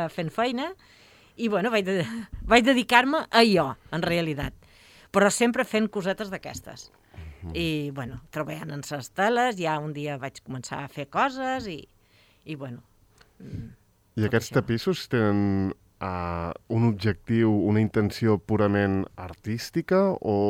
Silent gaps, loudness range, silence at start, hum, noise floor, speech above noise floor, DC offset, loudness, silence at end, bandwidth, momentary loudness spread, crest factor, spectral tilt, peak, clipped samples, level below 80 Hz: none; 10 LU; 0 s; none; -60 dBFS; 35 dB; under 0.1%; -25 LUFS; 0 s; 16.5 kHz; 18 LU; 24 dB; -5.5 dB/octave; -2 dBFS; under 0.1%; -52 dBFS